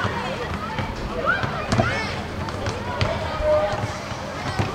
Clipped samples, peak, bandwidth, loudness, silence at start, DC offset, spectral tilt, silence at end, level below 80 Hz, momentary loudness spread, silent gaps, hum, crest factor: under 0.1%; -2 dBFS; 16 kHz; -25 LUFS; 0 s; under 0.1%; -5.5 dB/octave; 0 s; -38 dBFS; 7 LU; none; none; 22 dB